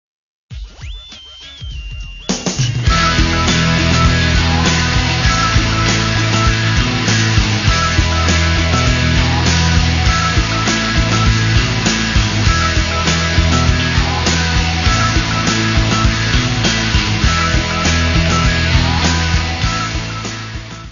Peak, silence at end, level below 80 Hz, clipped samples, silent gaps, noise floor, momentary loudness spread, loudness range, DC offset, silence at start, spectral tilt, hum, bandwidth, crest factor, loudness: 0 dBFS; 0 s; -20 dBFS; under 0.1%; none; -34 dBFS; 11 LU; 2 LU; under 0.1%; 0.5 s; -4 dB/octave; none; 7.4 kHz; 14 dB; -14 LUFS